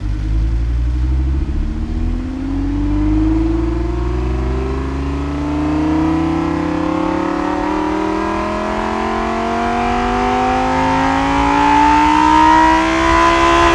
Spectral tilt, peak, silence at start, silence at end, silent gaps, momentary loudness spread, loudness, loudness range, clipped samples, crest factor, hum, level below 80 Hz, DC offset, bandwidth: -6 dB/octave; 0 dBFS; 0 s; 0 s; none; 10 LU; -16 LUFS; 6 LU; under 0.1%; 14 dB; none; -22 dBFS; under 0.1%; 11 kHz